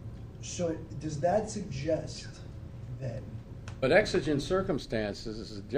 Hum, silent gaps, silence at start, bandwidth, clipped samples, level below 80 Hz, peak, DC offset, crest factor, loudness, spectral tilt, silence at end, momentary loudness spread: none; none; 0 s; 14.5 kHz; under 0.1%; -50 dBFS; -8 dBFS; under 0.1%; 24 dB; -32 LUFS; -5.5 dB/octave; 0 s; 19 LU